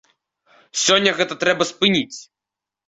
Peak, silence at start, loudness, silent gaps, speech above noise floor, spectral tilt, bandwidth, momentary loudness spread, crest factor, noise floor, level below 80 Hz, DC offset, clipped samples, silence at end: -2 dBFS; 0.75 s; -18 LUFS; none; 68 dB; -2.5 dB/octave; 8.4 kHz; 14 LU; 20 dB; -87 dBFS; -62 dBFS; under 0.1%; under 0.1%; 0.65 s